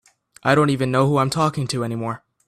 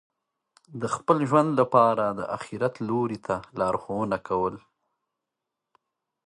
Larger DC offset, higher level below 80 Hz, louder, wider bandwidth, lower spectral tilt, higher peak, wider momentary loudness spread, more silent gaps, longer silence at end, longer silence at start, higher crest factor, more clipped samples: neither; first, -54 dBFS vs -62 dBFS; first, -20 LUFS vs -25 LUFS; first, 13.5 kHz vs 11 kHz; about the same, -6 dB/octave vs -7 dB/octave; first, -2 dBFS vs -6 dBFS; second, 9 LU vs 12 LU; neither; second, 0.3 s vs 1.7 s; second, 0.45 s vs 0.7 s; about the same, 18 dB vs 22 dB; neither